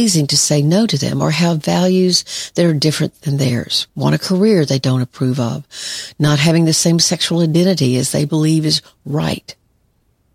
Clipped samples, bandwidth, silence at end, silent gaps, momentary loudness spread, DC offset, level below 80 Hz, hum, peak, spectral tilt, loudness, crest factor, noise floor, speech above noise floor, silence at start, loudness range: under 0.1%; 15.5 kHz; 0.8 s; none; 8 LU; under 0.1%; -52 dBFS; none; 0 dBFS; -4.5 dB/octave; -15 LUFS; 16 dB; -60 dBFS; 45 dB; 0 s; 2 LU